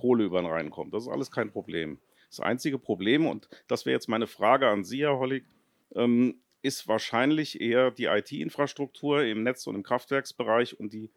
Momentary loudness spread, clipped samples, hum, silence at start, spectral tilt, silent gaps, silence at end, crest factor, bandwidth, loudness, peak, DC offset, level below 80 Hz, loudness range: 10 LU; under 0.1%; none; 0.05 s; -5 dB/octave; none; 0.1 s; 20 dB; 16.5 kHz; -28 LUFS; -8 dBFS; under 0.1%; -72 dBFS; 3 LU